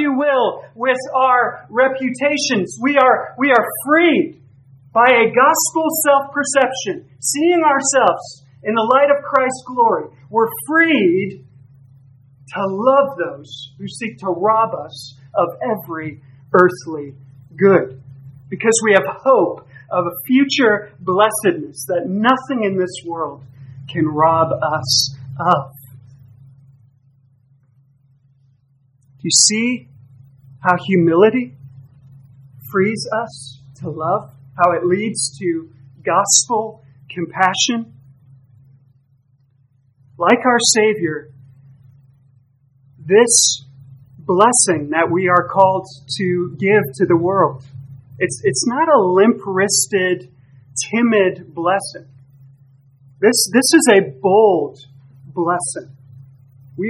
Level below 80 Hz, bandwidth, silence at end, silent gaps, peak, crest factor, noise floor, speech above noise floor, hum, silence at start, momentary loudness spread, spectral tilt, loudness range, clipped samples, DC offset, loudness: -64 dBFS; 15.5 kHz; 0 s; none; 0 dBFS; 18 dB; -57 dBFS; 41 dB; none; 0 s; 15 LU; -3.5 dB/octave; 6 LU; under 0.1%; under 0.1%; -16 LUFS